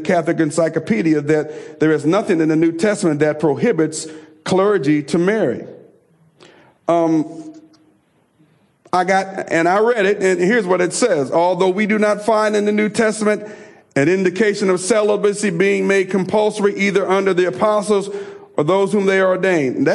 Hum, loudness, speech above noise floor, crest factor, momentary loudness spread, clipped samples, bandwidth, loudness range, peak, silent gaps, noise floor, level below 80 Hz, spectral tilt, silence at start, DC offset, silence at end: none; -16 LUFS; 42 dB; 12 dB; 6 LU; under 0.1%; 11.5 kHz; 5 LU; -4 dBFS; none; -58 dBFS; -64 dBFS; -5.5 dB/octave; 0 s; under 0.1%; 0 s